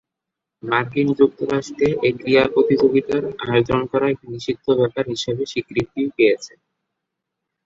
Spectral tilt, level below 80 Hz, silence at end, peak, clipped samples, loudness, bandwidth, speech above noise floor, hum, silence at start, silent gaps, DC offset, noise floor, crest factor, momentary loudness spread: -6 dB/octave; -52 dBFS; 1.2 s; -2 dBFS; under 0.1%; -19 LUFS; 7.8 kHz; 64 dB; none; 0.65 s; none; under 0.1%; -83 dBFS; 18 dB; 9 LU